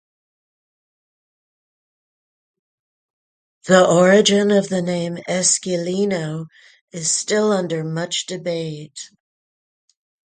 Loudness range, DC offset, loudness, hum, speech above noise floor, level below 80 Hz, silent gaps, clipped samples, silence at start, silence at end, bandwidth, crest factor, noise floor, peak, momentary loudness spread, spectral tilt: 6 LU; under 0.1%; -18 LUFS; none; over 72 dB; -66 dBFS; 6.81-6.88 s; under 0.1%; 3.65 s; 1.2 s; 9.6 kHz; 20 dB; under -90 dBFS; 0 dBFS; 21 LU; -4 dB/octave